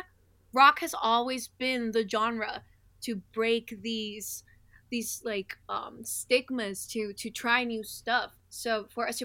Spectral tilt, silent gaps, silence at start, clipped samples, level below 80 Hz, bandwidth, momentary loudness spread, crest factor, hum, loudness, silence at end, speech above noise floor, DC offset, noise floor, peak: -2.5 dB/octave; none; 0 s; under 0.1%; -66 dBFS; 17 kHz; 11 LU; 24 dB; none; -30 LUFS; 0 s; 32 dB; under 0.1%; -62 dBFS; -8 dBFS